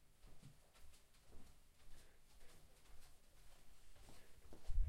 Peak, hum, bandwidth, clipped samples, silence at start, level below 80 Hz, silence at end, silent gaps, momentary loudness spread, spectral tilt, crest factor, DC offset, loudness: -28 dBFS; none; 14.5 kHz; under 0.1%; 0 s; -52 dBFS; 0 s; none; 4 LU; -5 dB/octave; 22 dB; under 0.1%; -65 LUFS